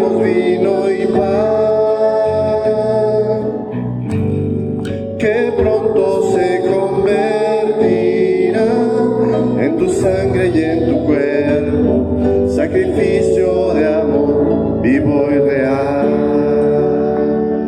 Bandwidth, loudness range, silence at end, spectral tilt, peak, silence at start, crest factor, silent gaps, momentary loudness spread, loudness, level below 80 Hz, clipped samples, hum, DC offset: 9.8 kHz; 2 LU; 0 s; -7.5 dB/octave; -2 dBFS; 0 s; 12 dB; none; 4 LU; -14 LUFS; -40 dBFS; under 0.1%; none; under 0.1%